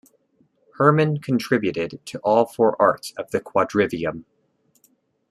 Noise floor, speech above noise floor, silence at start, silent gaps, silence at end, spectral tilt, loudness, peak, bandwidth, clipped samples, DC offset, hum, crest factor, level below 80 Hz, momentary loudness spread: -65 dBFS; 44 dB; 0.8 s; none; 1.1 s; -6.5 dB/octave; -21 LUFS; -2 dBFS; 14 kHz; under 0.1%; under 0.1%; none; 20 dB; -62 dBFS; 11 LU